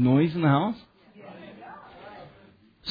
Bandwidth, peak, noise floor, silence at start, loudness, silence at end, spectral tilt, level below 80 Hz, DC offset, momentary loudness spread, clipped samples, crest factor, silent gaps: 5 kHz; -10 dBFS; -56 dBFS; 0 s; -24 LUFS; 0 s; -10 dB/octave; -62 dBFS; under 0.1%; 24 LU; under 0.1%; 18 dB; none